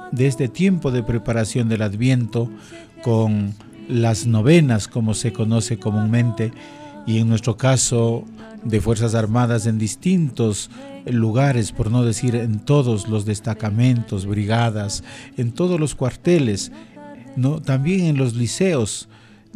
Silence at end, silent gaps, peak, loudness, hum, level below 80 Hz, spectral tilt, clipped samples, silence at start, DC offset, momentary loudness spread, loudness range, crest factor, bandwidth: 0.55 s; none; -4 dBFS; -20 LUFS; none; -44 dBFS; -6 dB/octave; under 0.1%; 0 s; under 0.1%; 10 LU; 2 LU; 16 dB; 12 kHz